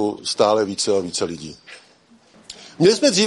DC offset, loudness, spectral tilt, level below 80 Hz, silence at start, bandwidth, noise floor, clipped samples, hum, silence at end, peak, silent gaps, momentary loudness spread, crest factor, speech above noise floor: under 0.1%; -19 LUFS; -3.5 dB/octave; -62 dBFS; 0 s; 11.5 kHz; -53 dBFS; under 0.1%; none; 0 s; -2 dBFS; none; 23 LU; 18 dB; 34 dB